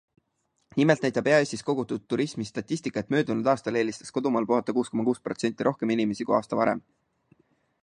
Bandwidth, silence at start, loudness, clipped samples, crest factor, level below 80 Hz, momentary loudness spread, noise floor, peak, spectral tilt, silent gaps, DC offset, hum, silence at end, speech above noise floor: 10.5 kHz; 0.75 s; -26 LUFS; under 0.1%; 20 dB; -68 dBFS; 8 LU; -75 dBFS; -6 dBFS; -6 dB/octave; none; under 0.1%; none; 1.05 s; 49 dB